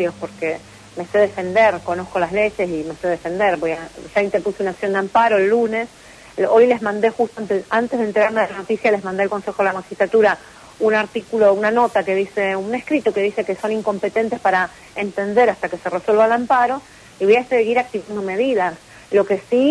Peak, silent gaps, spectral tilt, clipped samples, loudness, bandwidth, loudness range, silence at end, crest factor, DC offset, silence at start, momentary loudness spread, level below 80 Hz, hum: -4 dBFS; none; -5.5 dB/octave; under 0.1%; -19 LUFS; 11 kHz; 2 LU; 0 s; 14 dB; under 0.1%; 0 s; 9 LU; -56 dBFS; none